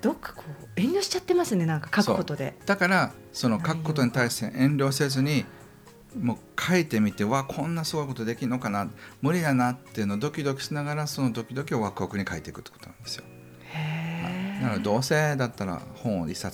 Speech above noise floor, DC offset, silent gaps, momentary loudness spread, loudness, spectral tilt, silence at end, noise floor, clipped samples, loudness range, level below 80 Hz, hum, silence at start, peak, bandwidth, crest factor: 24 dB; under 0.1%; none; 13 LU; -27 LUFS; -5.5 dB/octave; 0 s; -50 dBFS; under 0.1%; 6 LU; -60 dBFS; none; 0 s; -10 dBFS; over 20 kHz; 18 dB